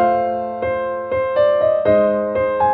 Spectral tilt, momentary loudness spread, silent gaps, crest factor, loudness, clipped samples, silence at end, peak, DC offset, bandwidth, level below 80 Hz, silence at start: -9.5 dB/octave; 7 LU; none; 14 dB; -18 LUFS; under 0.1%; 0 s; -4 dBFS; under 0.1%; 4.6 kHz; -48 dBFS; 0 s